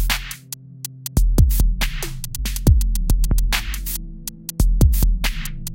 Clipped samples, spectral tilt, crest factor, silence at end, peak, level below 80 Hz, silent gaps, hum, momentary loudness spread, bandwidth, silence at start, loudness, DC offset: under 0.1%; -4.5 dB/octave; 16 dB; 0 s; -2 dBFS; -20 dBFS; none; none; 14 LU; 17.5 kHz; 0 s; -21 LUFS; under 0.1%